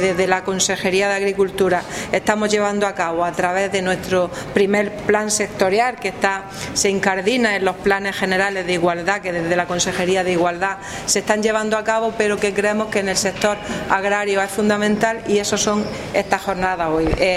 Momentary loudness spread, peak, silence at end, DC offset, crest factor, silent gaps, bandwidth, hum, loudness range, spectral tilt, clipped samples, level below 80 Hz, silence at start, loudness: 4 LU; 0 dBFS; 0 s; under 0.1%; 18 dB; none; 15.5 kHz; none; 1 LU; -3.5 dB/octave; under 0.1%; -42 dBFS; 0 s; -19 LUFS